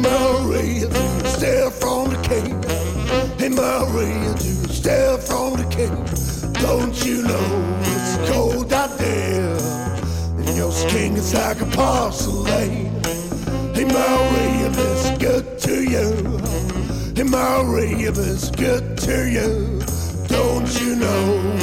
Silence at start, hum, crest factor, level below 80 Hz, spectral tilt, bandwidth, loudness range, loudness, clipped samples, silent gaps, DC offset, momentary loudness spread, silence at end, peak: 0 s; none; 12 dB; -30 dBFS; -5 dB/octave; 17 kHz; 1 LU; -20 LUFS; under 0.1%; none; under 0.1%; 5 LU; 0 s; -6 dBFS